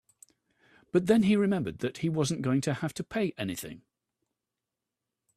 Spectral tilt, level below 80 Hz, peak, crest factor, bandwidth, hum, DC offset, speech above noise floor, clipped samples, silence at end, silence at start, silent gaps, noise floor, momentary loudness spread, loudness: -6 dB/octave; -64 dBFS; -12 dBFS; 20 dB; 14.5 kHz; none; under 0.1%; 60 dB; under 0.1%; 1.6 s; 0.95 s; none; -88 dBFS; 12 LU; -29 LUFS